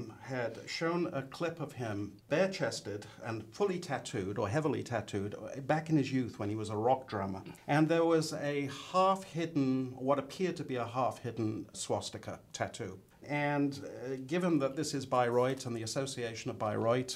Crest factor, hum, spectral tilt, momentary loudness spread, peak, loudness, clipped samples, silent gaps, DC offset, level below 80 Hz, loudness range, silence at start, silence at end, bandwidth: 18 dB; none; -5.5 dB/octave; 11 LU; -16 dBFS; -35 LUFS; under 0.1%; none; under 0.1%; -72 dBFS; 5 LU; 0 s; 0 s; 15.5 kHz